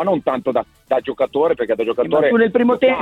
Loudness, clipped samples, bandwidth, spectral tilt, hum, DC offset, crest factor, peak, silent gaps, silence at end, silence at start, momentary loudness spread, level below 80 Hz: -17 LUFS; under 0.1%; 4.3 kHz; -7.5 dB/octave; none; under 0.1%; 14 dB; -2 dBFS; none; 0 s; 0 s; 7 LU; -54 dBFS